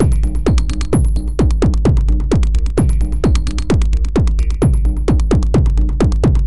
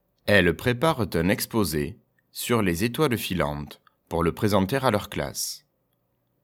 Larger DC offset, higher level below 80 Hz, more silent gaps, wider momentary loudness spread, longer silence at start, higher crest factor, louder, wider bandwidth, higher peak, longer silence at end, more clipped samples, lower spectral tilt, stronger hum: first, 5% vs under 0.1%; first, -14 dBFS vs -48 dBFS; neither; second, 3 LU vs 12 LU; second, 0 s vs 0.25 s; second, 12 dB vs 24 dB; first, -16 LUFS vs -25 LUFS; second, 11.5 kHz vs 19 kHz; about the same, 0 dBFS vs -2 dBFS; second, 0 s vs 0.85 s; neither; first, -7.5 dB/octave vs -5 dB/octave; neither